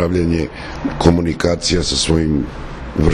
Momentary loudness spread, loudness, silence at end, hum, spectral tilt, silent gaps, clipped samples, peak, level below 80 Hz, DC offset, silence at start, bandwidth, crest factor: 11 LU; -17 LUFS; 0 s; none; -5 dB/octave; none; under 0.1%; 0 dBFS; -28 dBFS; under 0.1%; 0 s; 11.5 kHz; 16 dB